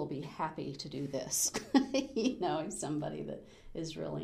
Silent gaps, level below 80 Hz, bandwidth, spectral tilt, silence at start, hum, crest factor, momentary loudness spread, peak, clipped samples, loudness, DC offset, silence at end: none; -62 dBFS; 15.5 kHz; -4 dB/octave; 0 s; none; 22 dB; 13 LU; -14 dBFS; under 0.1%; -35 LUFS; under 0.1%; 0 s